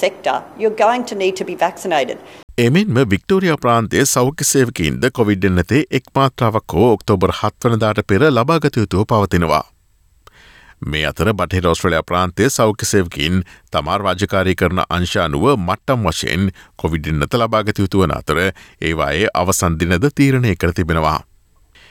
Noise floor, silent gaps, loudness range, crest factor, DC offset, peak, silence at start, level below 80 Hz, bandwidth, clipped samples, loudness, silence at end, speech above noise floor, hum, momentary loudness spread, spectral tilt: -54 dBFS; 2.43-2.48 s; 3 LU; 14 dB; under 0.1%; -2 dBFS; 0 s; -38 dBFS; 18 kHz; under 0.1%; -16 LUFS; 0.7 s; 38 dB; none; 6 LU; -5 dB/octave